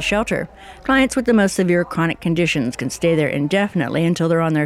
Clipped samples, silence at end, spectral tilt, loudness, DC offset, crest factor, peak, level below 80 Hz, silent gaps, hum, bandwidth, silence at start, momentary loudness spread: under 0.1%; 0 s; -5.5 dB/octave; -18 LUFS; under 0.1%; 14 dB; -4 dBFS; -44 dBFS; none; none; 14.5 kHz; 0 s; 7 LU